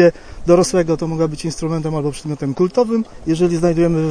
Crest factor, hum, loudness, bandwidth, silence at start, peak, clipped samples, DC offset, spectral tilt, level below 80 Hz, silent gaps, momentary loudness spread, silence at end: 16 dB; none; -18 LUFS; 10.5 kHz; 0 s; 0 dBFS; under 0.1%; under 0.1%; -6.5 dB/octave; -38 dBFS; none; 9 LU; 0 s